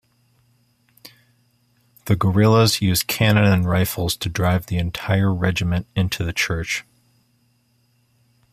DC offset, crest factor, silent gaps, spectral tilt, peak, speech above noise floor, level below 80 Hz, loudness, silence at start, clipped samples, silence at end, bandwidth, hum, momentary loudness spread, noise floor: under 0.1%; 20 dB; none; -5 dB/octave; -2 dBFS; 44 dB; -44 dBFS; -19 LUFS; 1.05 s; under 0.1%; 1.7 s; 15.5 kHz; none; 9 LU; -63 dBFS